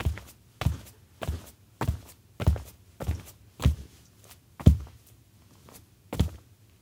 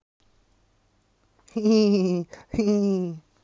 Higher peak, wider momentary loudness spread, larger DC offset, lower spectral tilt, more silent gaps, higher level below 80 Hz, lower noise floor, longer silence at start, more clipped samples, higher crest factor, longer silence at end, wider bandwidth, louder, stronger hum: first, -2 dBFS vs -10 dBFS; first, 28 LU vs 13 LU; neither; about the same, -7 dB/octave vs -7 dB/octave; neither; first, -36 dBFS vs -56 dBFS; second, -57 dBFS vs -66 dBFS; second, 0 s vs 1.55 s; neither; first, 28 dB vs 14 dB; first, 0.45 s vs 0.25 s; first, 17.5 kHz vs 7.4 kHz; second, -31 LUFS vs -24 LUFS; neither